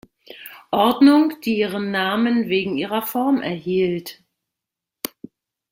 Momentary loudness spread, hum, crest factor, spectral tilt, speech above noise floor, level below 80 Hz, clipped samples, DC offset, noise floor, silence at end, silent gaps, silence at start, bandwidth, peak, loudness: 18 LU; none; 18 dB; -5.5 dB/octave; 66 dB; -64 dBFS; under 0.1%; under 0.1%; -85 dBFS; 0.65 s; none; 0.3 s; 16.5 kHz; -2 dBFS; -19 LUFS